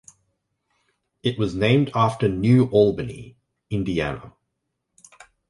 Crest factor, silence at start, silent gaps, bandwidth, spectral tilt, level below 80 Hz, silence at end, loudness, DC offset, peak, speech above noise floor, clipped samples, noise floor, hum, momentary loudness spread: 18 dB; 1.25 s; none; 11.5 kHz; -7.5 dB/octave; -48 dBFS; 1.2 s; -21 LUFS; under 0.1%; -4 dBFS; 58 dB; under 0.1%; -78 dBFS; none; 14 LU